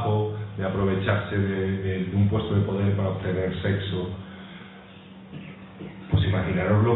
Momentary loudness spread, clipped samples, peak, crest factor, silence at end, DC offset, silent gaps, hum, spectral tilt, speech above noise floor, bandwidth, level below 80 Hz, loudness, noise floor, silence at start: 19 LU; under 0.1%; -8 dBFS; 16 dB; 0 s; under 0.1%; none; none; -11.5 dB/octave; 21 dB; 4.1 kHz; -46 dBFS; -25 LUFS; -45 dBFS; 0 s